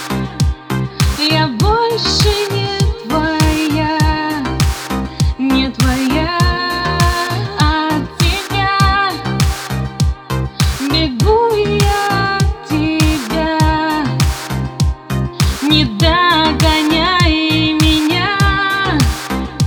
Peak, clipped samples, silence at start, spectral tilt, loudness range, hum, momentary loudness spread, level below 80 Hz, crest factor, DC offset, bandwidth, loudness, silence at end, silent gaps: 0 dBFS; under 0.1%; 0 s; -5 dB/octave; 3 LU; none; 7 LU; -22 dBFS; 14 dB; under 0.1%; over 20 kHz; -14 LUFS; 0 s; none